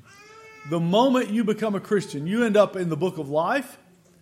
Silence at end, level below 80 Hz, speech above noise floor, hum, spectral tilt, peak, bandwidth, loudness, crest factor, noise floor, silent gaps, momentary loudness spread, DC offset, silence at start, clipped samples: 0.45 s; -70 dBFS; 25 dB; none; -6 dB/octave; -6 dBFS; 15.5 kHz; -23 LUFS; 18 dB; -48 dBFS; none; 8 LU; under 0.1%; 0.35 s; under 0.1%